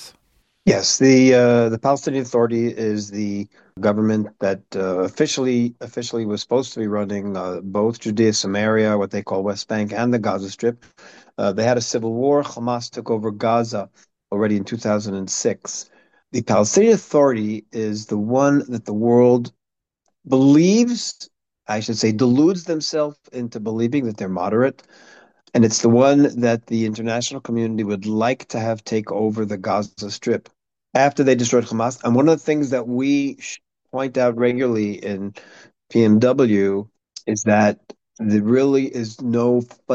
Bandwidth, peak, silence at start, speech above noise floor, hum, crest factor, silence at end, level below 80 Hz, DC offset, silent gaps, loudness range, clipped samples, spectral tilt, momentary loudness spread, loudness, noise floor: 8.4 kHz; -2 dBFS; 0 s; 63 dB; none; 16 dB; 0 s; -64 dBFS; under 0.1%; none; 5 LU; under 0.1%; -5.5 dB/octave; 12 LU; -19 LUFS; -82 dBFS